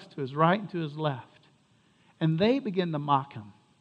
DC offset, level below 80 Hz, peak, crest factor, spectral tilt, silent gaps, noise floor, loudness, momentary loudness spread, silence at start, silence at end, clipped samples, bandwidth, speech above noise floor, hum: under 0.1%; -70 dBFS; -8 dBFS; 22 dB; -8.5 dB/octave; none; -64 dBFS; -28 LUFS; 13 LU; 0 s; 0.3 s; under 0.1%; 5.6 kHz; 37 dB; none